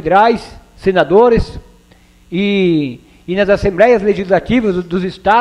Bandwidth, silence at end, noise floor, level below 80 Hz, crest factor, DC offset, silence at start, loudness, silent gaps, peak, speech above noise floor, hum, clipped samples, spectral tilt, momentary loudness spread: 11 kHz; 0 s; -46 dBFS; -32 dBFS; 14 dB; under 0.1%; 0.05 s; -13 LUFS; none; 0 dBFS; 34 dB; none; under 0.1%; -7 dB/octave; 11 LU